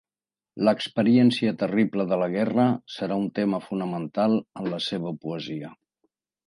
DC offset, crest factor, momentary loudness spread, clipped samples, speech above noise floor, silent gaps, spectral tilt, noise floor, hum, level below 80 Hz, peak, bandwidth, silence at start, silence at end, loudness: under 0.1%; 18 dB; 12 LU; under 0.1%; over 66 dB; none; -7 dB/octave; under -90 dBFS; none; -70 dBFS; -8 dBFS; 11 kHz; 0.55 s; 0.75 s; -25 LUFS